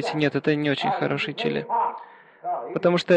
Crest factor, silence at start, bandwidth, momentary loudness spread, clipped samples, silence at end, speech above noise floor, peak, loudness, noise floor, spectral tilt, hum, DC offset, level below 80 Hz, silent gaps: 16 dB; 0 s; 9.4 kHz; 8 LU; under 0.1%; 0 s; 21 dB; -6 dBFS; -25 LUFS; -44 dBFS; -6.5 dB/octave; none; under 0.1%; -66 dBFS; none